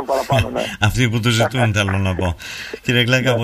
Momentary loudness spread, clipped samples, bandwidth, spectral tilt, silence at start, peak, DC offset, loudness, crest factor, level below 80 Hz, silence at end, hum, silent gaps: 8 LU; under 0.1%; 15.5 kHz; -5 dB/octave; 0 s; -2 dBFS; under 0.1%; -18 LUFS; 16 dB; -36 dBFS; 0 s; none; none